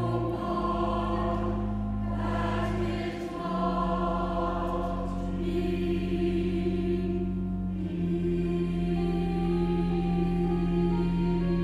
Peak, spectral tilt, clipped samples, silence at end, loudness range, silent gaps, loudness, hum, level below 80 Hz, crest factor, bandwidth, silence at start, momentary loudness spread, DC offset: -16 dBFS; -8.5 dB/octave; under 0.1%; 0 s; 2 LU; none; -29 LUFS; none; -36 dBFS; 12 dB; 8 kHz; 0 s; 5 LU; under 0.1%